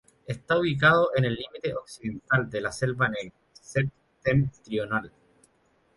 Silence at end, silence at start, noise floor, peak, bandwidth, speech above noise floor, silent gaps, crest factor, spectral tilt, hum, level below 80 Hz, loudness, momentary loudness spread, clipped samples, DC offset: 0.9 s; 0.3 s; -66 dBFS; -6 dBFS; 11.5 kHz; 40 dB; none; 22 dB; -6 dB/octave; none; -54 dBFS; -26 LUFS; 16 LU; under 0.1%; under 0.1%